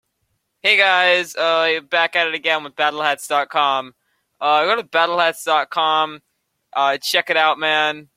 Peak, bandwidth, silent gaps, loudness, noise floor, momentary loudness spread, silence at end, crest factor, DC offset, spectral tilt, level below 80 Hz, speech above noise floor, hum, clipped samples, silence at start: -2 dBFS; 16.5 kHz; none; -17 LUFS; -71 dBFS; 6 LU; 0.15 s; 18 dB; under 0.1%; -1.5 dB/octave; -72 dBFS; 53 dB; none; under 0.1%; 0.65 s